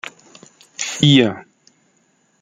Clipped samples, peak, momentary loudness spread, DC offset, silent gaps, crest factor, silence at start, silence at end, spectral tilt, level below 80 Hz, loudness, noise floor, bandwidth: under 0.1%; 0 dBFS; 23 LU; under 0.1%; none; 20 dB; 0.05 s; 1 s; -4.5 dB/octave; -56 dBFS; -15 LUFS; -61 dBFS; 9.6 kHz